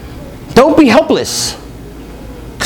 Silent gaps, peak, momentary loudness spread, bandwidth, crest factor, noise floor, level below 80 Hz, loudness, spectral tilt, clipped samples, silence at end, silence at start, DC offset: none; 0 dBFS; 24 LU; over 20 kHz; 12 dB; -29 dBFS; -34 dBFS; -10 LUFS; -4 dB/octave; 0.9%; 0 s; 0 s; under 0.1%